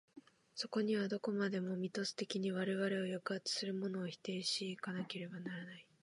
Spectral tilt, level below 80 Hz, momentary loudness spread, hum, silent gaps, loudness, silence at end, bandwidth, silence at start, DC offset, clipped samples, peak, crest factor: -4.5 dB/octave; -88 dBFS; 8 LU; none; none; -40 LUFS; 0.2 s; 11.5 kHz; 0.15 s; under 0.1%; under 0.1%; -24 dBFS; 16 dB